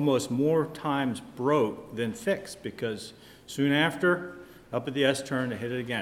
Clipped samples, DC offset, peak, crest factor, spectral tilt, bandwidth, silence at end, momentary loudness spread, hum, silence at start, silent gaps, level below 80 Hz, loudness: under 0.1%; under 0.1%; -8 dBFS; 20 dB; -5.5 dB/octave; 16 kHz; 0 s; 13 LU; none; 0 s; none; -64 dBFS; -28 LUFS